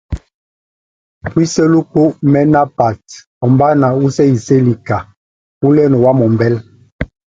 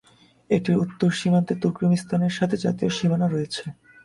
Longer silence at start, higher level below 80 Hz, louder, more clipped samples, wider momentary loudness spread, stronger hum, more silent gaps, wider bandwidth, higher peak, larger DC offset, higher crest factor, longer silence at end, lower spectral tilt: second, 0.1 s vs 0.5 s; first, -38 dBFS vs -58 dBFS; first, -12 LUFS vs -23 LUFS; neither; first, 16 LU vs 5 LU; neither; first, 0.34-1.21 s, 3.27-3.41 s, 5.17-5.61 s, 6.92-6.99 s vs none; second, 7.8 kHz vs 11.5 kHz; first, 0 dBFS vs -6 dBFS; neither; about the same, 12 dB vs 16 dB; about the same, 0.35 s vs 0.3 s; about the same, -7.5 dB/octave vs -6.5 dB/octave